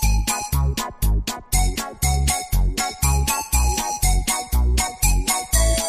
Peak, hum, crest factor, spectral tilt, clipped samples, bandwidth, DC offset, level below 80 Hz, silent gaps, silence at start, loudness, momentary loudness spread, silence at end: -4 dBFS; none; 16 dB; -3 dB/octave; under 0.1%; 15.5 kHz; under 0.1%; -22 dBFS; none; 0 s; -21 LUFS; 4 LU; 0 s